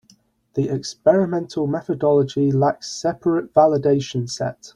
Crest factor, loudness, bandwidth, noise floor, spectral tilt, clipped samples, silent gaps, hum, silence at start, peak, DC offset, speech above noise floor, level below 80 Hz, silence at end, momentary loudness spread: 18 dB; -20 LUFS; 11 kHz; -57 dBFS; -6.5 dB/octave; under 0.1%; none; none; 0.55 s; -2 dBFS; under 0.1%; 38 dB; -58 dBFS; 0.05 s; 9 LU